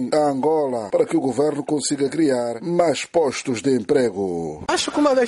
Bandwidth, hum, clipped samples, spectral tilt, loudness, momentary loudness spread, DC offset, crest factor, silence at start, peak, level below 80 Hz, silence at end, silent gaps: 11.5 kHz; none; under 0.1%; -4.5 dB/octave; -21 LUFS; 4 LU; under 0.1%; 14 dB; 0 s; -6 dBFS; -56 dBFS; 0 s; none